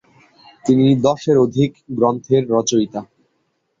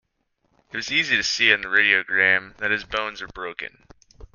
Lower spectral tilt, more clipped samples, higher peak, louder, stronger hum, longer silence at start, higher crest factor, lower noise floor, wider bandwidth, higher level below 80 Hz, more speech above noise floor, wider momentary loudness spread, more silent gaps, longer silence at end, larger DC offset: first, -6.5 dB/octave vs -1.5 dB/octave; neither; about the same, -2 dBFS vs -2 dBFS; first, -17 LUFS vs -20 LUFS; neither; about the same, 0.65 s vs 0.75 s; second, 16 dB vs 22 dB; about the same, -68 dBFS vs -71 dBFS; about the same, 7.8 kHz vs 7.4 kHz; about the same, -54 dBFS vs -54 dBFS; first, 52 dB vs 48 dB; second, 8 LU vs 16 LU; neither; first, 0.75 s vs 0.1 s; neither